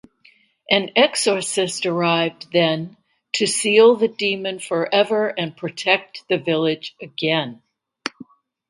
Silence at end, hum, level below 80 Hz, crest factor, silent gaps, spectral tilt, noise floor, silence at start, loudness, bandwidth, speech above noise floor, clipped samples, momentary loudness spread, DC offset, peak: 0.45 s; none; -68 dBFS; 20 dB; none; -3.5 dB/octave; -56 dBFS; 0.7 s; -19 LUFS; 11.5 kHz; 36 dB; under 0.1%; 13 LU; under 0.1%; 0 dBFS